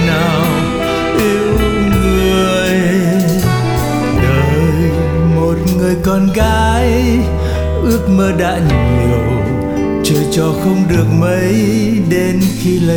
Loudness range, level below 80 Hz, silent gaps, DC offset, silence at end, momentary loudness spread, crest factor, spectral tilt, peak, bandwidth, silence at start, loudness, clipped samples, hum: 1 LU; -22 dBFS; none; under 0.1%; 0 s; 3 LU; 10 dB; -6.5 dB/octave; 0 dBFS; over 20 kHz; 0 s; -13 LUFS; under 0.1%; none